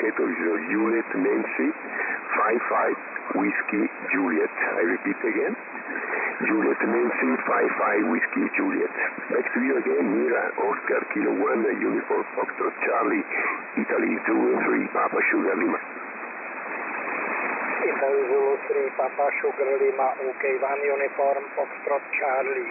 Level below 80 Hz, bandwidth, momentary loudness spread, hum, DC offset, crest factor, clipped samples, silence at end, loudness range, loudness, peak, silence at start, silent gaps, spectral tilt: -82 dBFS; 2.9 kHz; 6 LU; none; under 0.1%; 10 dB; under 0.1%; 0 s; 2 LU; -25 LUFS; -14 dBFS; 0 s; none; -12 dB/octave